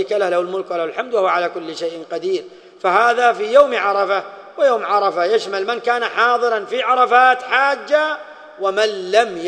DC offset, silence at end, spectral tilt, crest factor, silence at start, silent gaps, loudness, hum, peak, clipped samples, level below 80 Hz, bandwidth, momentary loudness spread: under 0.1%; 0 s; -3 dB/octave; 18 dB; 0 s; none; -17 LUFS; none; 0 dBFS; under 0.1%; -68 dBFS; 9.8 kHz; 11 LU